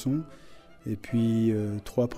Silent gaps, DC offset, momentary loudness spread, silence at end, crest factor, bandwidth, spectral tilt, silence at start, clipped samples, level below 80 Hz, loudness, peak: none; under 0.1%; 15 LU; 0 s; 14 dB; 14 kHz; -8 dB/octave; 0 s; under 0.1%; -54 dBFS; -28 LUFS; -14 dBFS